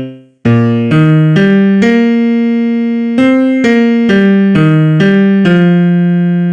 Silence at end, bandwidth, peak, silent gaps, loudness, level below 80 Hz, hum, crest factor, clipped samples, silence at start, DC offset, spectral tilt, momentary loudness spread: 0 s; 8.2 kHz; 0 dBFS; none; -9 LUFS; -46 dBFS; none; 8 dB; under 0.1%; 0 s; under 0.1%; -8.5 dB/octave; 4 LU